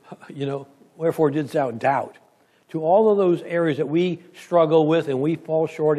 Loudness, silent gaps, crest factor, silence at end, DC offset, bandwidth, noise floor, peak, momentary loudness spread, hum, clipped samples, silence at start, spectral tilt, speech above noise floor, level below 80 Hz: -21 LUFS; none; 16 dB; 0 s; under 0.1%; 13.5 kHz; -58 dBFS; -6 dBFS; 13 LU; none; under 0.1%; 0.1 s; -7.5 dB/octave; 37 dB; -74 dBFS